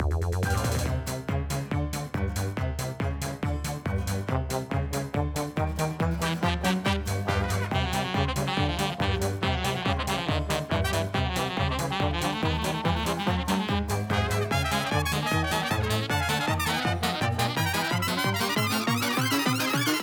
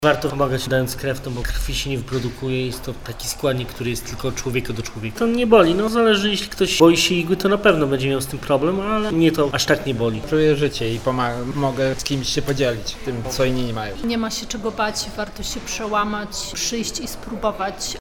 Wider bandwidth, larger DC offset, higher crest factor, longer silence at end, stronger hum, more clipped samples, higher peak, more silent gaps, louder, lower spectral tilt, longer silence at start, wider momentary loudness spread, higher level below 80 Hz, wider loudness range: about the same, 19.5 kHz vs 19.5 kHz; neither; about the same, 16 dB vs 20 dB; about the same, 0 s vs 0 s; neither; neither; second, -10 dBFS vs 0 dBFS; neither; second, -27 LUFS vs -21 LUFS; about the same, -4.5 dB/octave vs -4.5 dB/octave; about the same, 0 s vs 0 s; second, 5 LU vs 10 LU; about the same, -38 dBFS vs -36 dBFS; second, 4 LU vs 8 LU